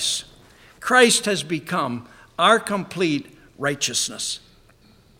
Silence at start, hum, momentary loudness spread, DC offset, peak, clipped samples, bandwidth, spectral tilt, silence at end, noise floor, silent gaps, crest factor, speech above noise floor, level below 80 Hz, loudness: 0 s; none; 13 LU; under 0.1%; -2 dBFS; under 0.1%; 17 kHz; -2.5 dB/octave; 0.8 s; -54 dBFS; none; 22 dB; 33 dB; -58 dBFS; -21 LUFS